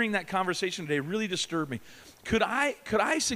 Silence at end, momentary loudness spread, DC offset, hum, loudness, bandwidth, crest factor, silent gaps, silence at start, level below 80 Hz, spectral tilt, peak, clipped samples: 0 s; 8 LU; under 0.1%; none; -29 LUFS; 15.5 kHz; 16 dB; none; 0 s; -56 dBFS; -3.5 dB/octave; -12 dBFS; under 0.1%